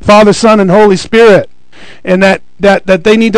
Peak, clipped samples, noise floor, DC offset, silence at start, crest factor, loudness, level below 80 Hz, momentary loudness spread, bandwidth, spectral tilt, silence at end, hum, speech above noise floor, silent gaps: 0 dBFS; 10%; -36 dBFS; under 0.1%; 0 s; 6 dB; -6 LUFS; -36 dBFS; 6 LU; 12 kHz; -5.5 dB/octave; 0 s; none; 31 dB; none